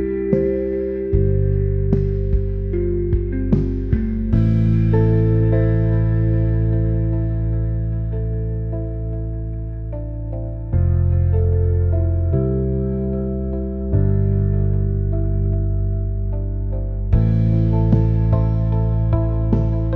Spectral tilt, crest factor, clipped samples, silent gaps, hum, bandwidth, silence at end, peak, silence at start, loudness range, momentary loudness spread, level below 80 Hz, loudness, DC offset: -12.5 dB/octave; 14 dB; under 0.1%; none; none; 3.1 kHz; 0 s; -4 dBFS; 0 s; 5 LU; 8 LU; -24 dBFS; -20 LUFS; 0.2%